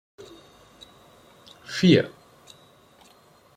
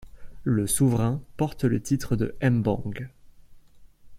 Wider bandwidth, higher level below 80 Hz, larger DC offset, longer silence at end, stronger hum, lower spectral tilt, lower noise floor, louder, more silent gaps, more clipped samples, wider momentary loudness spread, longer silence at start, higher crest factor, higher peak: second, 10 kHz vs 16 kHz; second, -62 dBFS vs -46 dBFS; neither; first, 1.5 s vs 0 s; neither; about the same, -6 dB/octave vs -6.5 dB/octave; first, -56 dBFS vs -50 dBFS; first, -21 LUFS vs -26 LUFS; neither; neither; first, 28 LU vs 12 LU; first, 1.7 s vs 0 s; first, 24 dB vs 18 dB; first, -4 dBFS vs -8 dBFS